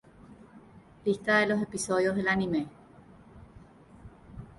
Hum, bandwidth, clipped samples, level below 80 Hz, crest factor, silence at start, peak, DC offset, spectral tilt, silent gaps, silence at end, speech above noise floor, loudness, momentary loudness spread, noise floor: none; 11.5 kHz; under 0.1%; -58 dBFS; 18 dB; 0.3 s; -12 dBFS; under 0.1%; -5 dB/octave; none; 0.15 s; 26 dB; -28 LUFS; 17 LU; -54 dBFS